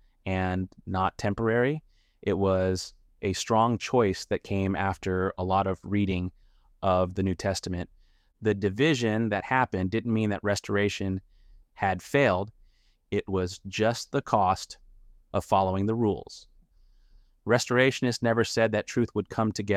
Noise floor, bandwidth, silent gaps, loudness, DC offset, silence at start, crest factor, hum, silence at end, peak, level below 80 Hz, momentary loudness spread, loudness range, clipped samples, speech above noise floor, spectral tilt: -61 dBFS; 14.5 kHz; none; -27 LUFS; under 0.1%; 0.25 s; 20 dB; none; 0 s; -8 dBFS; -54 dBFS; 9 LU; 2 LU; under 0.1%; 35 dB; -5.5 dB/octave